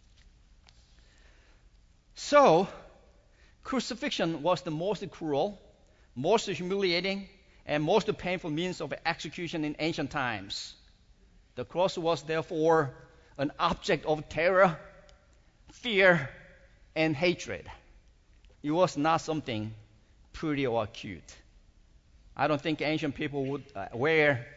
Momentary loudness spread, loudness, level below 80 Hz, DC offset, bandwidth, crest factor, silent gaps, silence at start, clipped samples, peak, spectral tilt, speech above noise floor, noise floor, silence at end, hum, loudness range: 18 LU; -29 LUFS; -58 dBFS; under 0.1%; 8 kHz; 22 dB; none; 2.15 s; under 0.1%; -10 dBFS; -5 dB/octave; 32 dB; -61 dBFS; 0 s; none; 5 LU